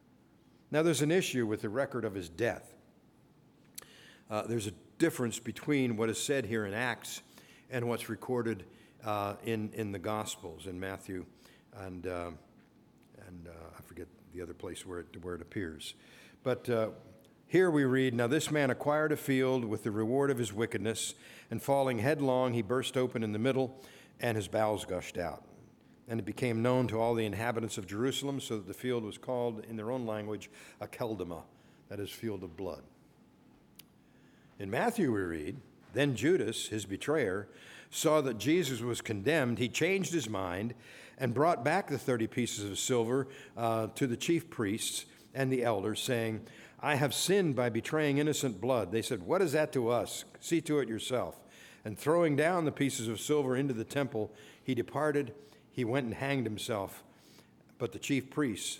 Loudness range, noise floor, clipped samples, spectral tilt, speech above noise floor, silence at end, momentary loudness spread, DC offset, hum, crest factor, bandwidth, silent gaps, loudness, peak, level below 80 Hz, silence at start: 10 LU; -63 dBFS; under 0.1%; -5 dB/octave; 30 dB; 0 s; 15 LU; under 0.1%; none; 20 dB; 18.5 kHz; none; -33 LUFS; -14 dBFS; -68 dBFS; 0.7 s